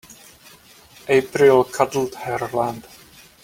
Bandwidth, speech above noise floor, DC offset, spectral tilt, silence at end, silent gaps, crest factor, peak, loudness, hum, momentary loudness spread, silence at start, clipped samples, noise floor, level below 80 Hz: 16.5 kHz; 29 dB; under 0.1%; -5 dB/octave; 0.6 s; none; 20 dB; -2 dBFS; -19 LUFS; none; 12 LU; 1.05 s; under 0.1%; -48 dBFS; -58 dBFS